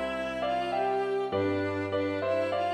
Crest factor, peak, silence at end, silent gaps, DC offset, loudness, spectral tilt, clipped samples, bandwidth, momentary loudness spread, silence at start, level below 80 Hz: 12 dB; -18 dBFS; 0 s; none; under 0.1%; -30 LUFS; -6.5 dB/octave; under 0.1%; 11.5 kHz; 2 LU; 0 s; -60 dBFS